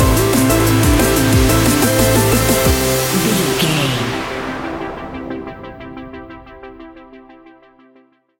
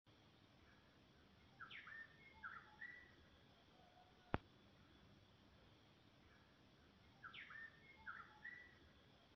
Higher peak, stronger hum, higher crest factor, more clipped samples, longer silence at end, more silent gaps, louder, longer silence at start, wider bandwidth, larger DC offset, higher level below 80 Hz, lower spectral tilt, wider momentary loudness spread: first, -2 dBFS vs -20 dBFS; neither; second, 14 dB vs 40 dB; neither; first, 1.2 s vs 0 s; neither; first, -14 LUFS vs -57 LUFS; about the same, 0 s vs 0.05 s; first, 17 kHz vs 6.2 kHz; neither; first, -26 dBFS vs -74 dBFS; about the same, -4.5 dB/octave vs -3.5 dB/octave; about the same, 20 LU vs 19 LU